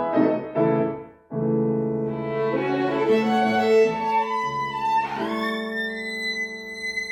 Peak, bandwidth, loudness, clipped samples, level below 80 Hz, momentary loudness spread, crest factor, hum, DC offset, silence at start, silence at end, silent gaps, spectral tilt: -6 dBFS; 14 kHz; -23 LUFS; under 0.1%; -60 dBFS; 8 LU; 16 dB; none; under 0.1%; 0 s; 0 s; none; -6 dB/octave